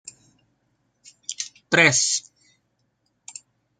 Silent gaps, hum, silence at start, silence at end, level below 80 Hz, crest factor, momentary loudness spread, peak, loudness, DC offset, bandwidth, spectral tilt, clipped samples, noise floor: none; none; 1.3 s; 1.6 s; -68 dBFS; 26 dB; 25 LU; -2 dBFS; -19 LUFS; under 0.1%; 10.5 kHz; -2 dB/octave; under 0.1%; -71 dBFS